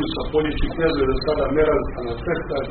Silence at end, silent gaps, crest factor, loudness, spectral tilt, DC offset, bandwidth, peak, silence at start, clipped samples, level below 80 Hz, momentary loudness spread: 0 s; none; 14 dB; -22 LUFS; -5 dB/octave; under 0.1%; 4.5 kHz; -6 dBFS; 0 s; under 0.1%; -30 dBFS; 6 LU